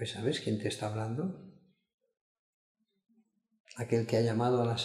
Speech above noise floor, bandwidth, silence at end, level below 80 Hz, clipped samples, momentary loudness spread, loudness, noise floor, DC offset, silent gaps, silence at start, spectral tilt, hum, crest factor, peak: 40 dB; 12.5 kHz; 0 s; -72 dBFS; under 0.1%; 13 LU; -33 LUFS; -72 dBFS; under 0.1%; 1.94-1.98 s, 2.21-2.75 s, 3.60-3.65 s; 0 s; -6 dB/octave; none; 20 dB; -14 dBFS